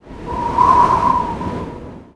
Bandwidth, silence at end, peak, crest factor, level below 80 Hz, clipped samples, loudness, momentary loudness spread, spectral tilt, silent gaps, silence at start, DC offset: 11 kHz; 0.1 s; 0 dBFS; 16 dB; -34 dBFS; under 0.1%; -15 LUFS; 17 LU; -6.5 dB/octave; none; 0.05 s; 0.3%